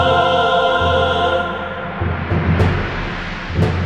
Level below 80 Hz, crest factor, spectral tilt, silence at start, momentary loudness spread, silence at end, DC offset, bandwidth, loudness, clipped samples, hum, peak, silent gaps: -30 dBFS; 14 dB; -6.5 dB/octave; 0 s; 10 LU; 0 s; under 0.1%; 9 kHz; -17 LUFS; under 0.1%; none; -2 dBFS; none